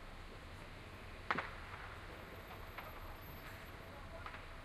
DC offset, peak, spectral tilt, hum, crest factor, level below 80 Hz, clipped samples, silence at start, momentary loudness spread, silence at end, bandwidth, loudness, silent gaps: under 0.1%; -20 dBFS; -5 dB/octave; none; 30 dB; -56 dBFS; under 0.1%; 0 s; 12 LU; 0 s; 15.5 kHz; -49 LUFS; none